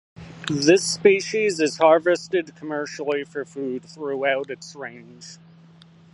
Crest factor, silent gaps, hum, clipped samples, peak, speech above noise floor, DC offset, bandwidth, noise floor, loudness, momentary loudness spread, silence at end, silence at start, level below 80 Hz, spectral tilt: 20 dB; none; none; under 0.1%; -2 dBFS; 28 dB; under 0.1%; 11.5 kHz; -50 dBFS; -22 LUFS; 20 LU; 0.8 s; 0.2 s; -64 dBFS; -4 dB/octave